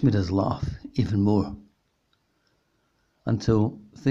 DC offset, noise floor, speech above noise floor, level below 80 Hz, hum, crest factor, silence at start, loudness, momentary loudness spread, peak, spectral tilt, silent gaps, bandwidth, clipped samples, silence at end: under 0.1%; -70 dBFS; 47 dB; -48 dBFS; none; 18 dB; 0 s; -26 LUFS; 11 LU; -8 dBFS; -8.5 dB/octave; none; 7.4 kHz; under 0.1%; 0 s